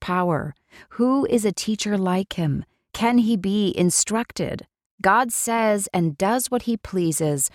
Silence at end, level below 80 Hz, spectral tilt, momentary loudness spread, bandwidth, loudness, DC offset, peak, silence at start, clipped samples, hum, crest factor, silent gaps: 0.05 s; -52 dBFS; -4.5 dB/octave; 9 LU; 17 kHz; -22 LUFS; under 0.1%; -4 dBFS; 0 s; under 0.1%; none; 18 dB; 4.86-4.98 s